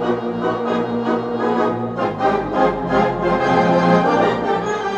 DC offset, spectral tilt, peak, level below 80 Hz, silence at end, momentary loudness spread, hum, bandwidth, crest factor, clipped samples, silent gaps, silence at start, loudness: under 0.1%; -7 dB/octave; -2 dBFS; -44 dBFS; 0 s; 6 LU; none; 8.4 kHz; 16 dB; under 0.1%; none; 0 s; -18 LUFS